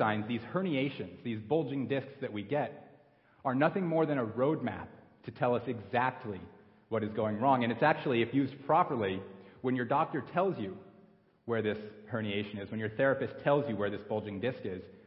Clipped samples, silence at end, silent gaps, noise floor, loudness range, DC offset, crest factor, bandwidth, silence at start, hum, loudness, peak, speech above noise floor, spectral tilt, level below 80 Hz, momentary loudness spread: under 0.1%; 0.1 s; none; -63 dBFS; 4 LU; under 0.1%; 20 dB; 5.6 kHz; 0 s; none; -33 LUFS; -12 dBFS; 31 dB; -10.5 dB/octave; -66 dBFS; 13 LU